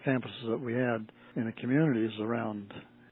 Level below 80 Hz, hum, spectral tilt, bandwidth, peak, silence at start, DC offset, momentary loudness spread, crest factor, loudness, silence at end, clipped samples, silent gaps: -76 dBFS; none; -6.5 dB/octave; 4.4 kHz; -14 dBFS; 0 s; under 0.1%; 13 LU; 18 dB; -32 LUFS; 0.25 s; under 0.1%; none